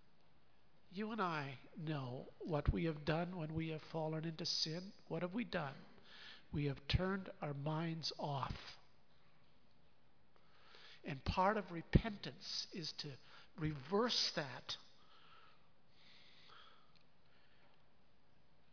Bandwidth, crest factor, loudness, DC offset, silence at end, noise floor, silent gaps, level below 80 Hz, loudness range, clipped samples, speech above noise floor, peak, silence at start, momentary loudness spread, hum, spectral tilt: 5.4 kHz; 26 dB; -42 LUFS; under 0.1%; 2.05 s; -75 dBFS; none; -54 dBFS; 6 LU; under 0.1%; 33 dB; -18 dBFS; 0.9 s; 19 LU; none; -4 dB/octave